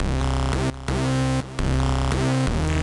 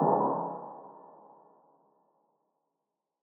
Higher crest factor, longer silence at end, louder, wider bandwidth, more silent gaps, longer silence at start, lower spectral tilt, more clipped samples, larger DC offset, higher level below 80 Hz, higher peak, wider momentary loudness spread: second, 8 dB vs 22 dB; second, 0 s vs 2.15 s; first, -23 LUFS vs -31 LUFS; first, 11.5 kHz vs 2.1 kHz; neither; about the same, 0 s vs 0 s; about the same, -6 dB/octave vs -6.5 dB/octave; neither; neither; first, -28 dBFS vs under -90 dBFS; about the same, -14 dBFS vs -14 dBFS; second, 3 LU vs 26 LU